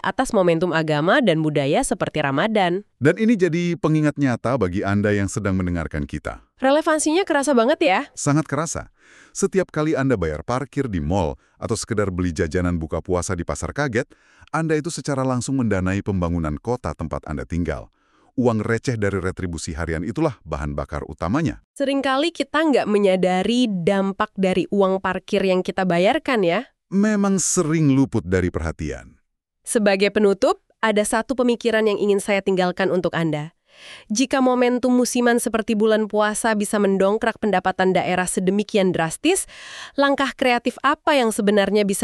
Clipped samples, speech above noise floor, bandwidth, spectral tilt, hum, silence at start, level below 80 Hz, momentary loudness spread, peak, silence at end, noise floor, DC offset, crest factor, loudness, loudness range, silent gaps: under 0.1%; 47 dB; 13.5 kHz; -5 dB/octave; none; 0.05 s; -42 dBFS; 9 LU; -2 dBFS; 0 s; -68 dBFS; under 0.1%; 18 dB; -21 LUFS; 5 LU; 21.64-21.74 s